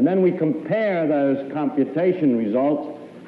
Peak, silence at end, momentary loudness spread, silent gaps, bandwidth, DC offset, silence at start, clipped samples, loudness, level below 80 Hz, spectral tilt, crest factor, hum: -8 dBFS; 0 s; 5 LU; none; 4.8 kHz; under 0.1%; 0 s; under 0.1%; -21 LUFS; -74 dBFS; -10 dB/octave; 12 dB; none